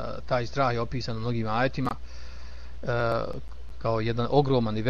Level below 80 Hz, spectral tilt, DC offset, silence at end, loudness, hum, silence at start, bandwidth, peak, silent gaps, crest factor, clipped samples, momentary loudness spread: -44 dBFS; -7.5 dB/octave; 2%; 0 s; -28 LUFS; none; 0 s; 7.4 kHz; -8 dBFS; none; 20 dB; under 0.1%; 20 LU